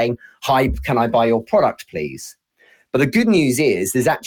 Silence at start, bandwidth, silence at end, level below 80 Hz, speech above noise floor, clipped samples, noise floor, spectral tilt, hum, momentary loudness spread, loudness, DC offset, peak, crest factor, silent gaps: 0 s; 19 kHz; 0 s; -38 dBFS; 38 dB; under 0.1%; -55 dBFS; -5 dB/octave; none; 12 LU; -18 LUFS; under 0.1%; -4 dBFS; 14 dB; none